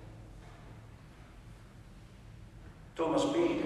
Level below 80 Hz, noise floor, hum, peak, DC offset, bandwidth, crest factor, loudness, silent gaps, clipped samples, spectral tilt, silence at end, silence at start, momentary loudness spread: -56 dBFS; -53 dBFS; none; -18 dBFS; under 0.1%; 12 kHz; 20 dB; -31 LUFS; none; under 0.1%; -5.5 dB/octave; 0 s; 0 s; 24 LU